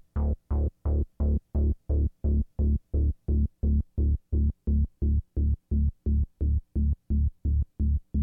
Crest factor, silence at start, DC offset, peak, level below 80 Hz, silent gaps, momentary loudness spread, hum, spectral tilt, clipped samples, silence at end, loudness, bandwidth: 8 dB; 0.15 s; under 0.1%; -18 dBFS; -28 dBFS; none; 2 LU; none; -13.5 dB/octave; under 0.1%; 0 s; -29 LUFS; 1.4 kHz